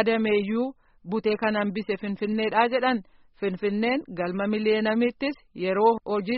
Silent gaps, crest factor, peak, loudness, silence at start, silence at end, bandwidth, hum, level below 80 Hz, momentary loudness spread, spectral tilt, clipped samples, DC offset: none; 18 dB; -6 dBFS; -26 LUFS; 0 s; 0 s; 5.6 kHz; none; -62 dBFS; 9 LU; -4 dB/octave; under 0.1%; under 0.1%